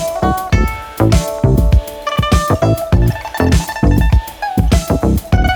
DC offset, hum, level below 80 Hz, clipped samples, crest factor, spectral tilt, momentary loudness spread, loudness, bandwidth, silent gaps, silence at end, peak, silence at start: under 0.1%; none; -18 dBFS; under 0.1%; 12 dB; -6 dB/octave; 4 LU; -14 LUFS; 19.5 kHz; none; 0 s; 0 dBFS; 0 s